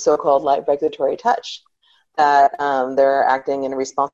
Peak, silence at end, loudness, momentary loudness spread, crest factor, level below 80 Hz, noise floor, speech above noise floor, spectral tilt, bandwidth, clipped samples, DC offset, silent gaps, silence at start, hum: -4 dBFS; 0.05 s; -18 LUFS; 8 LU; 14 dB; -62 dBFS; -60 dBFS; 43 dB; -3.5 dB/octave; 7.8 kHz; under 0.1%; under 0.1%; none; 0 s; none